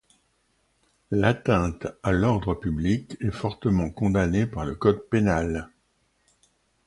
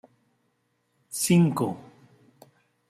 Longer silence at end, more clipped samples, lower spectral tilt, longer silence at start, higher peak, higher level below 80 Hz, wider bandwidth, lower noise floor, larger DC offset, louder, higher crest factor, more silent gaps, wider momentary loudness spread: about the same, 1.2 s vs 1.1 s; neither; first, -7.5 dB/octave vs -5.5 dB/octave; about the same, 1.1 s vs 1.1 s; first, -6 dBFS vs -10 dBFS; first, -40 dBFS vs -66 dBFS; second, 11.5 kHz vs 14.5 kHz; second, -69 dBFS vs -73 dBFS; neither; about the same, -25 LUFS vs -24 LUFS; about the same, 20 dB vs 20 dB; neither; second, 7 LU vs 16 LU